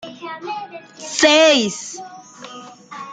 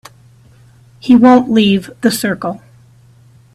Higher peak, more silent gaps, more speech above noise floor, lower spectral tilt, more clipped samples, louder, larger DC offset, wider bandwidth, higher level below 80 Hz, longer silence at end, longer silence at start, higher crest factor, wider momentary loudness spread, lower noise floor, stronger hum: about the same, -2 dBFS vs 0 dBFS; neither; second, 20 dB vs 34 dB; second, -2 dB/octave vs -5.5 dB/octave; neither; second, -15 LUFS vs -12 LUFS; neither; second, 9.6 kHz vs 14 kHz; second, -64 dBFS vs -52 dBFS; second, 0 s vs 1 s; second, 0.05 s vs 1.05 s; about the same, 18 dB vs 14 dB; first, 25 LU vs 17 LU; second, -38 dBFS vs -45 dBFS; neither